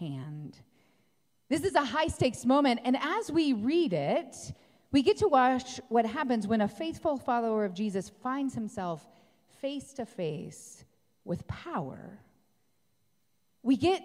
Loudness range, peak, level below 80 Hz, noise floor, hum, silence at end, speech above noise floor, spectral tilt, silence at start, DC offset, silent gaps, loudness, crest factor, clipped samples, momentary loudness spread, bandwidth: 11 LU; -12 dBFS; -60 dBFS; -77 dBFS; none; 0 s; 47 dB; -5.5 dB/octave; 0 s; under 0.1%; none; -30 LUFS; 18 dB; under 0.1%; 17 LU; 14.5 kHz